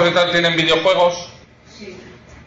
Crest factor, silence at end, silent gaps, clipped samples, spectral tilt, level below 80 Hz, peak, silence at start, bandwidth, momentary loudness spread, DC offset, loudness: 14 dB; 0.35 s; none; under 0.1%; -4 dB/octave; -52 dBFS; -4 dBFS; 0 s; 7.8 kHz; 22 LU; under 0.1%; -15 LUFS